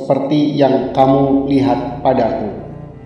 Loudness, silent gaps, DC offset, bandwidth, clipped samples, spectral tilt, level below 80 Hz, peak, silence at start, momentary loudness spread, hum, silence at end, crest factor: -14 LUFS; none; under 0.1%; 6.4 kHz; under 0.1%; -8.5 dB/octave; -42 dBFS; 0 dBFS; 0 s; 11 LU; none; 0 s; 14 dB